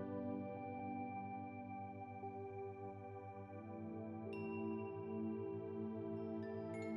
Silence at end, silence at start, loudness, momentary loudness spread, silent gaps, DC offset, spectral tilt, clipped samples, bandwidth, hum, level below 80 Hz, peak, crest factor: 0 s; 0 s; -48 LUFS; 7 LU; none; under 0.1%; -8 dB/octave; under 0.1%; 6.4 kHz; none; -84 dBFS; -32 dBFS; 14 dB